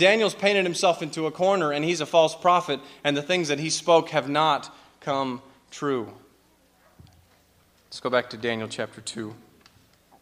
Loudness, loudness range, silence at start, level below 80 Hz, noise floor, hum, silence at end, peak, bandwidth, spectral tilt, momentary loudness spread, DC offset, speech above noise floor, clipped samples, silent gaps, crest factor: -24 LUFS; 10 LU; 0 s; -70 dBFS; -61 dBFS; none; 0.85 s; -4 dBFS; 15.5 kHz; -3.5 dB/octave; 14 LU; under 0.1%; 37 dB; under 0.1%; none; 22 dB